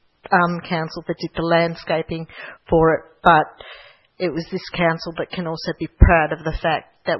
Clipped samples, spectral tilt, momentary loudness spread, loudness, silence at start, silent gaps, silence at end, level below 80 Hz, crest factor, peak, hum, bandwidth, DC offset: under 0.1%; -7.5 dB/octave; 13 LU; -20 LUFS; 0.3 s; none; 0 s; -30 dBFS; 20 dB; 0 dBFS; none; 6 kHz; under 0.1%